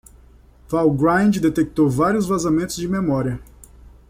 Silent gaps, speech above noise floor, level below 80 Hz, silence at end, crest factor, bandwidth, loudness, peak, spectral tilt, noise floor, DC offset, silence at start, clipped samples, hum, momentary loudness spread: none; 30 dB; -44 dBFS; 0.2 s; 14 dB; 16 kHz; -19 LUFS; -6 dBFS; -6.5 dB/octave; -48 dBFS; under 0.1%; 0.7 s; under 0.1%; none; 7 LU